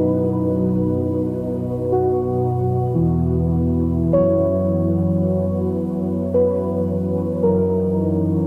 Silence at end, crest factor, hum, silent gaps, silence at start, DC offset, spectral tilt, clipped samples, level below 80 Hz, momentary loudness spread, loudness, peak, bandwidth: 0 s; 14 dB; none; none; 0 s; under 0.1%; -12 dB/octave; under 0.1%; -38 dBFS; 5 LU; -19 LUFS; -6 dBFS; 3.1 kHz